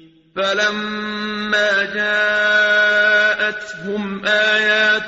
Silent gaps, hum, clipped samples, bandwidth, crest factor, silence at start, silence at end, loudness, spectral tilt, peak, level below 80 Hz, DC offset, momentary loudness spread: none; none; under 0.1%; 8 kHz; 14 dB; 0.35 s; 0 s; -16 LUFS; 0 dB/octave; -4 dBFS; -58 dBFS; under 0.1%; 11 LU